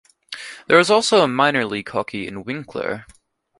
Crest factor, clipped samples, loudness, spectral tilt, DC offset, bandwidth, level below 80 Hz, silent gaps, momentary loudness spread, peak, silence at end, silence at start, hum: 20 dB; under 0.1%; -19 LUFS; -4 dB/octave; under 0.1%; 11.5 kHz; -58 dBFS; none; 18 LU; 0 dBFS; 0.55 s; 0.3 s; none